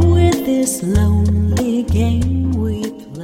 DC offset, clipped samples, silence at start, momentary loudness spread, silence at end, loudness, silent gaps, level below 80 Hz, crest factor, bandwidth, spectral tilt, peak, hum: under 0.1%; under 0.1%; 0 s; 6 LU; 0 s; -16 LUFS; none; -26 dBFS; 14 dB; 16 kHz; -6.5 dB/octave; -2 dBFS; none